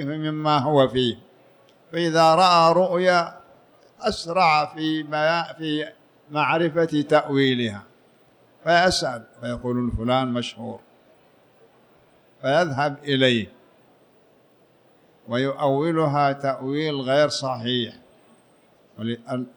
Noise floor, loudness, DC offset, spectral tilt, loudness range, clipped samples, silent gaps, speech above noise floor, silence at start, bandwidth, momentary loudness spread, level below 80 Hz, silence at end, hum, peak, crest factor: -58 dBFS; -22 LUFS; under 0.1%; -5 dB/octave; 6 LU; under 0.1%; none; 36 dB; 0 s; 19.5 kHz; 13 LU; -52 dBFS; 0.1 s; none; -6 dBFS; 18 dB